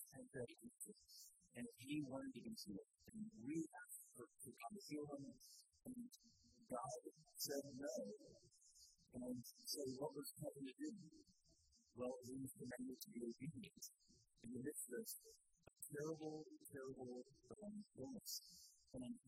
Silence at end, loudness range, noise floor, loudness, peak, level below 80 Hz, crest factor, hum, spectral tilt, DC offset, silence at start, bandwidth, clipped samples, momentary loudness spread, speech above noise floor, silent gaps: 0.1 s; 2 LU; -77 dBFS; -54 LUFS; -32 dBFS; -84 dBFS; 22 dB; none; -4 dB/octave; under 0.1%; 0 s; 15.5 kHz; under 0.1%; 13 LU; 24 dB; none